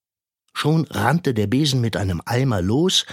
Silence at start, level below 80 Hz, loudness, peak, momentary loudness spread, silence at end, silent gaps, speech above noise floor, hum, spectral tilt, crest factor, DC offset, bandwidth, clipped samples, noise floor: 0.55 s; -48 dBFS; -20 LUFS; -2 dBFS; 6 LU; 0 s; none; 55 dB; none; -5 dB/octave; 18 dB; under 0.1%; 16 kHz; under 0.1%; -75 dBFS